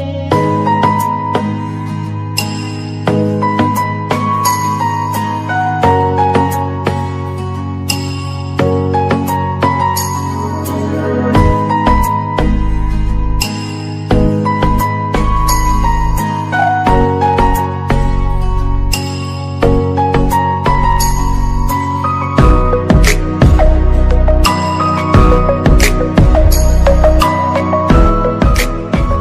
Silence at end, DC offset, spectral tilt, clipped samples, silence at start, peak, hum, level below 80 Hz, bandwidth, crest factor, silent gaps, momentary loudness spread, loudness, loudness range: 0 s; under 0.1%; -6 dB/octave; under 0.1%; 0 s; 0 dBFS; none; -16 dBFS; 15.5 kHz; 12 dB; none; 8 LU; -13 LUFS; 4 LU